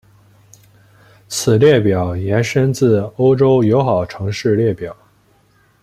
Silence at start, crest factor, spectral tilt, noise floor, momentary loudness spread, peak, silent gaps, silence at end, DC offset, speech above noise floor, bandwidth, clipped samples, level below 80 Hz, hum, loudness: 1.3 s; 14 dB; -6.5 dB/octave; -55 dBFS; 9 LU; -2 dBFS; none; 0.9 s; under 0.1%; 41 dB; 15 kHz; under 0.1%; -48 dBFS; none; -15 LUFS